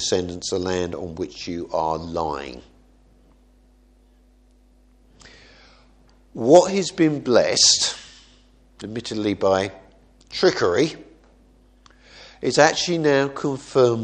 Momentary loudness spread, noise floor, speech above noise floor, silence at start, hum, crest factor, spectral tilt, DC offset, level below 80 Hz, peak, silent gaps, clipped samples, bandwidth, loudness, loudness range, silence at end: 17 LU; -55 dBFS; 35 dB; 0 s; none; 22 dB; -3.5 dB/octave; under 0.1%; -52 dBFS; 0 dBFS; none; under 0.1%; 10 kHz; -20 LUFS; 12 LU; 0 s